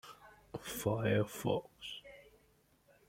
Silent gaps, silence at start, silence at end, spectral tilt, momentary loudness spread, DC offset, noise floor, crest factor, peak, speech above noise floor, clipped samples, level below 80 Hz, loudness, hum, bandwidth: none; 0.05 s; 0.85 s; -5.5 dB/octave; 22 LU; under 0.1%; -71 dBFS; 20 dB; -20 dBFS; 35 dB; under 0.1%; -66 dBFS; -37 LUFS; none; 16.5 kHz